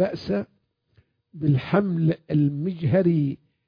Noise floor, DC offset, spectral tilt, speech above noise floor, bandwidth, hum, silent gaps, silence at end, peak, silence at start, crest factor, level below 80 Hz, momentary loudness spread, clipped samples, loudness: -63 dBFS; under 0.1%; -10.5 dB/octave; 41 dB; 5.2 kHz; none; none; 0.3 s; -6 dBFS; 0 s; 16 dB; -58 dBFS; 8 LU; under 0.1%; -24 LUFS